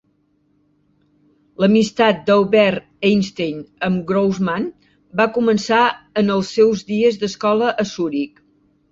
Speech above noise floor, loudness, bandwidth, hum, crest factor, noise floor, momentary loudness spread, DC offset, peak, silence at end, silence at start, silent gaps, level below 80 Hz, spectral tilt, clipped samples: 45 dB; -18 LUFS; 7.8 kHz; 50 Hz at -40 dBFS; 16 dB; -62 dBFS; 10 LU; under 0.1%; -2 dBFS; 0.65 s; 1.6 s; none; -56 dBFS; -6 dB/octave; under 0.1%